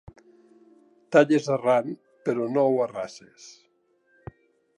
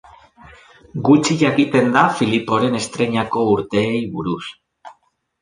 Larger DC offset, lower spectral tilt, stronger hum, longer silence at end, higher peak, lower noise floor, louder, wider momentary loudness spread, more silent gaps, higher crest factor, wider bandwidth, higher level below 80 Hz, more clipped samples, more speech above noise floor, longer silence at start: neither; about the same, -6 dB/octave vs -5.5 dB/octave; neither; first, 1.25 s vs 0.5 s; second, -6 dBFS vs -2 dBFS; first, -67 dBFS vs -57 dBFS; second, -24 LUFS vs -17 LUFS; first, 17 LU vs 10 LU; neither; about the same, 22 dB vs 18 dB; about the same, 11 kHz vs 10.5 kHz; second, -64 dBFS vs -54 dBFS; neither; about the same, 43 dB vs 40 dB; first, 1.1 s vs 0.95 s